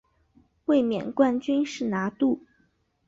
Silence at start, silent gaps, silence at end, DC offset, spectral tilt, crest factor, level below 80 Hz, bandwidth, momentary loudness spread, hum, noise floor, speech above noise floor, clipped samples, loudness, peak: 0.7 s; none; 0.7 s; under 0.1%; -6 dB/octave; 18 dB; -66 dBFS; 7.8 kHz; 5 LU; none; -68 dBFS; 44 dB; under 0.1%; -26 LUFS; -8 dBFS